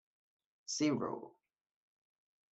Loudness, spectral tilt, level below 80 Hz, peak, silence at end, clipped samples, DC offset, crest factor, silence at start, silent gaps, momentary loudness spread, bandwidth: -37 LUFS; -4 dB/octave; -84 dBFS; -22 dBFS; 1.25 s; under 0.1%; under 0.1%; 20 dB; 0.7 s; none; 19 LU; 8.2 kHz